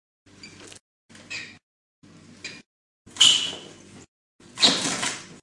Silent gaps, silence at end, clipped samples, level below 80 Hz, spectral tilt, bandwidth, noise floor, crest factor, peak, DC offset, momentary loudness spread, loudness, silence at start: 0.81-1.09 s, 1.63-2.02 s, 2.66-3.05 s, 4.08-4.39 s; 0.1 s; under 0.1%; -70 dBFS; 0 dB/octave; 11.5 kHz; -46 dBFS; 24 dB; -4 dBFS; under 0.1%; 27 LU; -19 LUFS; 0.45 s